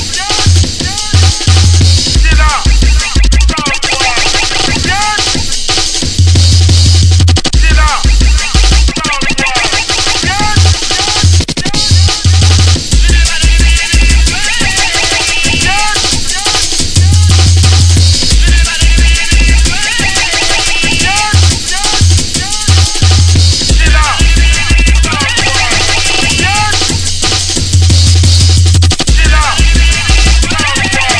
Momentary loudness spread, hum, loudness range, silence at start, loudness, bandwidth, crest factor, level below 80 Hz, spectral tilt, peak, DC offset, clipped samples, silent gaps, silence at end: 4 LU; none; 2 LU; 0 s; -8 LUFS; 11 kHz; 8 dB; -12 dBFS; -3 dB/octave; 0 dBFS; 1%; 0.4%; none; 0 s